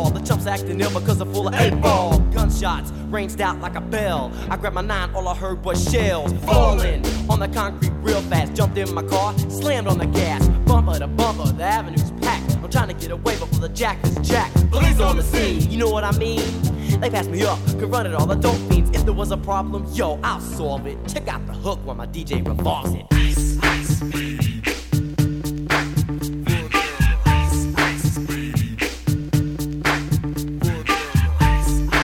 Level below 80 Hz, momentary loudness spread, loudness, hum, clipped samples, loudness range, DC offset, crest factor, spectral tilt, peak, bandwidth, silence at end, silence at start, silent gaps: -24 dBFS; 8 LU; -21 LUFS; none; under 0.1%; 3 LU; under 0.1%; 18 dB; -5.5 dB/octave; -2 dBFS; 17.5 kHz; 0 s; 0 s; none